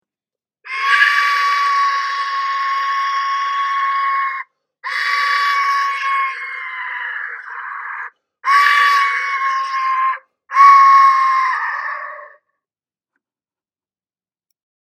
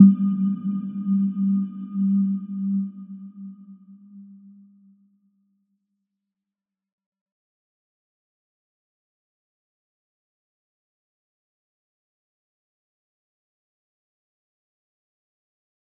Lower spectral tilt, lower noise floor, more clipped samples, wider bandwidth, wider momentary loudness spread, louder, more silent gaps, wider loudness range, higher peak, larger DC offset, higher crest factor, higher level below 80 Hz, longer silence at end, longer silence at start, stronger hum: second, 5 dB/octave vs -13.5 dB/octave; about the same, under -90 dBFS vs -88 dBFS; neither; first, 13.5 kHz vs 1.3 kHz; second, 16 LU vs 19 LU; first, -15 LUFS vs -23 LUFS; neither; second, 7 LU vs 21 LU; about the same, 0 dBFS vs -2 dBFS; neither; second, 18 dB vs 26 dB; about the same, under -90 dBFS vs -86 dBFS; second, 2.65 s vs 11.65 s; first, 0.65 s vs 0 s; neither